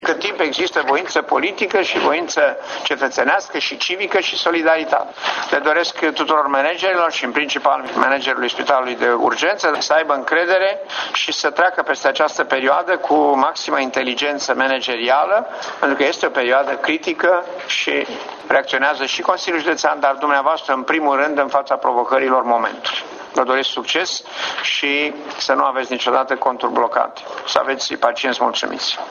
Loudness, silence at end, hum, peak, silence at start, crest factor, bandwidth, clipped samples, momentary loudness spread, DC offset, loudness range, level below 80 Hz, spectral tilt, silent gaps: -17 LUFS; 0 s; none; 0 dBFS; 0 s; 18 dB; 7.4 kHz; under 0.1%; 5 LU; under 0.1%; 2 LU; -68 dBFS; -1.5 dB/octave; none